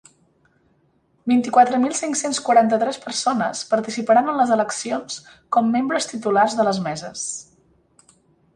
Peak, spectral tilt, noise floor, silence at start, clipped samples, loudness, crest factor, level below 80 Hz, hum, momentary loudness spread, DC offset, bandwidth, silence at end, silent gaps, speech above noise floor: -2 dBFS; -3.5 dB/octave; -62 dBFS; 1.25 s; under 0.1%; -20 LUFS; 18 dB; -66 dBFS; none; 12 LU; under 0.1%; 11.5 kHz; 1.15 s; none; 43 dB